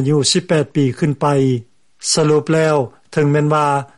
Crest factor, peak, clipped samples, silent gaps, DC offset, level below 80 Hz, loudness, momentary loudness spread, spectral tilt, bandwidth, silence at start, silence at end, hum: 12 dB; -2 dBFS; under 0.1%; none; under 0.1%; -54 dBFS; -16 LUFS; 5 LU; -5 dB/octave; 11.5 kHz; 0 s; 0.15 s; none